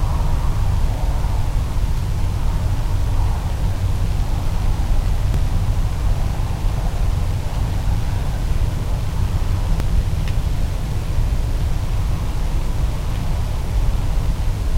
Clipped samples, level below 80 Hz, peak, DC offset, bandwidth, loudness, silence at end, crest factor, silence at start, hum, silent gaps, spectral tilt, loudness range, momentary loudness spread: under 0.1%; -20 dBFS; -6 dBFS; under 0.1%; 15.5 kHz; -23 LUFS; 0 s; 12 dB; 0 s; none; none; -6.5 dB/octave; 1 LU; 2 LU